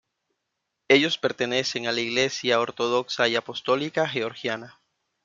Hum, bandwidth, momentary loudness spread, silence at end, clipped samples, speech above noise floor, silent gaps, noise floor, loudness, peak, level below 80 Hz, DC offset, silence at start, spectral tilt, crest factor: none; 7.6 kHz; 8 LU; 0.55 s; under 0.1%; 56 dB; none; -81 dBFS; -24 LUFS; -4 dBFS; -68 dBFS; under 0.1%; 0.9 s; -3.5 dB/octave; 22 dB